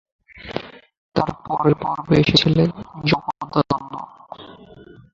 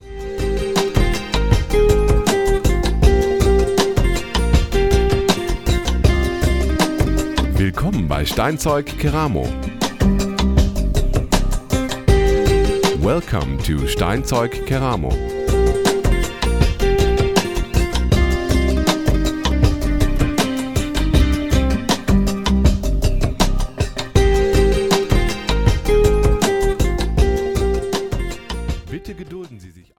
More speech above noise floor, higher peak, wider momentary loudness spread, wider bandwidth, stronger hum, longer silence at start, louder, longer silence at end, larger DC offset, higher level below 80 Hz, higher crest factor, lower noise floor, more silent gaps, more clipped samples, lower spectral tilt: about the same, 25 dB vs 22 dB; about the same, 0 dBFS vs 0 dBFS; first, 24 LU vs 6 LU; second, 7.6 kHz vs 17 kHz; neither; first, 0.35 s vs 0 s; about the same, -20 LUFS vs -18 LUFS; first, 0.3 s vs 0.15 s; second, under 0.1% vs 0.6%; second, -46 dBFS vs -20 dBFS; first, 22 dB vs 16 dB; about the same, -44 dBFS vs -41 dBFS; first, 0.98-1.09 s vs none; neither; about the same, -6.5 dB/octave vs -5.5 dB/octave